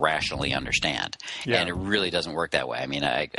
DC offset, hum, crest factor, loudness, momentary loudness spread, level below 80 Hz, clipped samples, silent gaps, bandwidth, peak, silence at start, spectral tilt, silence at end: under 0.1%; none; 22 dB; -26 LUFS; 5 LU; -48 dBFS; under 0.1%; none; 11.5 kHz; -6 dBFS; 0 s; -3.5 dB/octave; 0 s